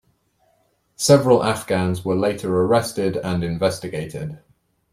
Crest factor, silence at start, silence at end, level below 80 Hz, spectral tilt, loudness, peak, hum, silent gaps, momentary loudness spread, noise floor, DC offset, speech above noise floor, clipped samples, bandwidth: 20 dB; 1 s; 0.55 s; -52 dBFS; -5.5 dB/octave; -20 LUFS; -2 dBFS; none; none; 13 LU; -64 dBFS; under 0.1%; 45 dB; under 0.1%; 16 kHz